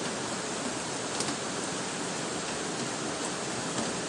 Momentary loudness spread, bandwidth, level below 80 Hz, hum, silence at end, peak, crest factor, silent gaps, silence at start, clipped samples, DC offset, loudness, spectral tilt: 2 LU; 11.5 kHz; -66 dBFS; none; 0 s; -14 dBFS; 20 dB; none; 0 s; under 0.1%; under 0.1%; -32 LUFS; -2.5 dB/octave